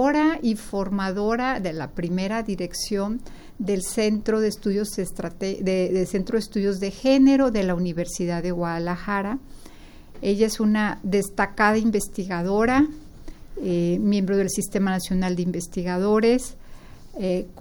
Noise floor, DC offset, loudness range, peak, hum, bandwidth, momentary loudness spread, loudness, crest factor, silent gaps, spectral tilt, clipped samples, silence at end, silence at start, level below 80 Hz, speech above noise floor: -43 dBFS; under 0.1%; 4 LU; -6 dBFS; none; over 20 kHz; 10 LU; -24 LUFS; 18 dB; none; -5.5 dB/octave; under 0.1%; 0 s; 0 s; -42 dBFS; 20 dB